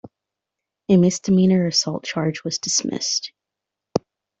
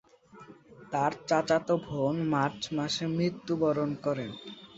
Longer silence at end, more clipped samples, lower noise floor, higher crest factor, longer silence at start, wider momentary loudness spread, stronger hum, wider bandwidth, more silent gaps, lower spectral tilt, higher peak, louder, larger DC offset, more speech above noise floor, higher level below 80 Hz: first, 0.4 s vs 0 s; neither; first, -85 dBFS vs -53 dBFS; about the same, 18 dB vs 20 dB; second, 0.05 s vs 0.35 s; first, 11 LU vs 7 LU; neither; about the same, 8 kHz vs 8 kHz; neither; second, -4.5 dB/octave vs -6 dB/octave; first, -4 dBFS vs -12 dBFS; first, -20 LUFS vs -30 LUFS; neither; first, 66 dB vs 24 dB; first, -60 dBFS vs -66 dBFS